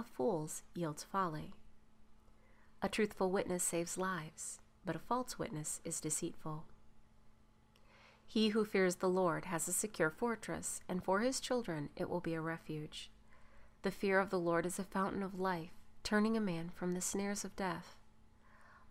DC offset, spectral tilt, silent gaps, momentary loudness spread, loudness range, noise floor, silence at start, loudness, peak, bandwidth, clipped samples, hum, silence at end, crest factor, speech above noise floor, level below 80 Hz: under 0.1%; -4 dB/octave; none; 11 LU; 5 LU; -66 dBFS; 0 s; -38 LUFS; -20 dBFS; 16 kHz; under 0.1%; none; 0 s; 20 dB; 28 dB; -64 dBFS